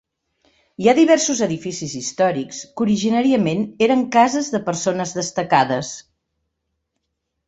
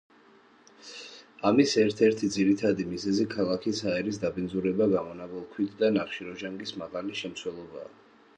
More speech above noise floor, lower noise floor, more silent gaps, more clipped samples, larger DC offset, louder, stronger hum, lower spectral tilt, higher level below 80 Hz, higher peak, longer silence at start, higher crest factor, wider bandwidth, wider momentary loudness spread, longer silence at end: first, 58 dB vs 30 dB; first, -76 dBFS vs -58 dBFS; neither; neither; neither; first, -18 LUFS vs -28 LUFS; neither; about the same, -4.5 dB/octave vs -5.5 dB/octave; about the same, -60 dBFS vs -62 dBFS; first, 0 dBFS vs -8 dBFS; about the same, 0.8 s vs 0.85 s; about the same, 18 dB vs 20 dB; second, 8.2 kHz vs 9.8 kHz; second, 11 LU vs 19 LU; first, 1.45 s vs 0.55 s